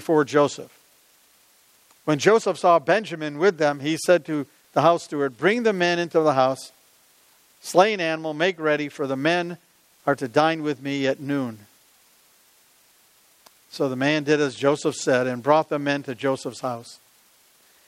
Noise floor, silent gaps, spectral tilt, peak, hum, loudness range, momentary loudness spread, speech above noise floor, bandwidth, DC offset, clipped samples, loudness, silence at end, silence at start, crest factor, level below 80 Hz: -58 dBFS; none; -5 dB/octave; -2 dBFS; none; 5 LU; 11 LU; 36 dB; 16 kHz; under 0.1%; under 0.1%; -22 LUFS; 0.95 s; 0 s; 22 dB; -76 dBFS